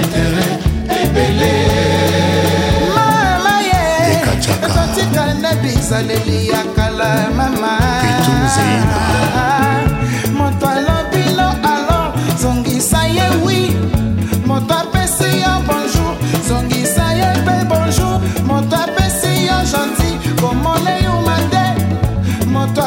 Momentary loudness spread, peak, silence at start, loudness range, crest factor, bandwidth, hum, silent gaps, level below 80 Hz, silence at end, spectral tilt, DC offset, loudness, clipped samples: 3 LU; -2 dBFS; 0 s; 2 LU; 10 dB; 16.5 kHz; none; none; -26 dBFS; 0 s; -5 dB/octave; under 0.1%; -14 LUFS; under 0.1%